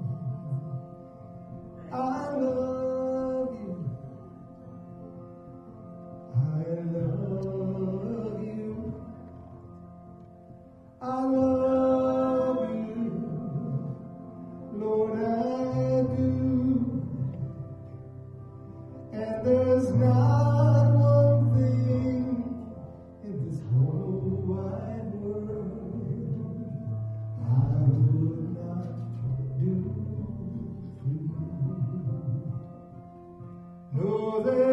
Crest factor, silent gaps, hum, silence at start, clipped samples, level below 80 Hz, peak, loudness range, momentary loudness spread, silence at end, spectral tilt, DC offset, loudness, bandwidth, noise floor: 16 dB; none; none; 0 s; under 0.1%; -54 dBFS; -12 dBFS; 11 LU; 22 LU; 0 s; -10.5 dB/octave; under 0.1%; -28 LUFS; 6.2 kHz; -50 dBFS